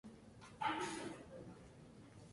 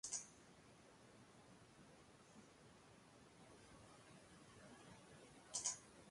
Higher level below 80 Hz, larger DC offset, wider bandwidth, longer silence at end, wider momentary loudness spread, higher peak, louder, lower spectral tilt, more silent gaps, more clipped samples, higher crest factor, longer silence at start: first, -72 dBFS vs -82 dBFS; neither; about the same, 11.5 kHz vs 11.5 kHz; about the same, 0 s vs 0 s; about the same, 19 LU vs 20 LU; about the same, -28 dBFS vs -28 dBFS; first, -45 LUFS vs -53 LUFS; first, -4 dB/octave vs -1.5 dB/octave; neither; neither; second, 20 dB vs 30 dB; about the same, 0.05 s vs 0.05 s